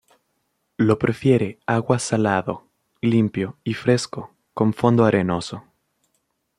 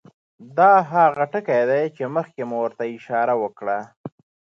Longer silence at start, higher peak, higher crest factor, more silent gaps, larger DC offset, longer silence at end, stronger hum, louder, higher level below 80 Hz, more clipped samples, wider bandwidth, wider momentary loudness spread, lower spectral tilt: first, 0.8 s vs 0.4 s; about the same, -2 dBFS vs -4 dBFS; about the same, 20 dB vs 18 dB; second, none vs 3.97-4.04 s; neither; first, 1 s vs 0.5 s; neither; about the same, -21 LUFS vs -20 LUFS; first, -58 dBFS vs -76 dBFS; neither; first, 11.5 kHz vs 7 kHz; about the same, 16 LU vs 14 LU; second, -6.5 dB/octave vs -8 dB/octave